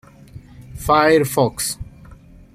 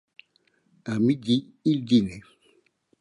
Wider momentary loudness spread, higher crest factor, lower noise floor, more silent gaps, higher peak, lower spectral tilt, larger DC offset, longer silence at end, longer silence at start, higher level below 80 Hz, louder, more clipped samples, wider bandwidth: first, 22 LU vs 15 LU; about the same, 18 dB vs 18 dB; second, -43 dBFS vs -67 dBFS; neither; first, -2 dBFS vs -8 dBFS; second, -4.5 dB/octave vs -7 dB/octave; neither; second, 0.4 s vs 0.8 s; second, 0.35 s vs 0.85 s; first, -42 dBFS vs -60 dBFS; first, -17 LUFS vs -25 LUFS; neither; first, 16 kHz vs 11 kHz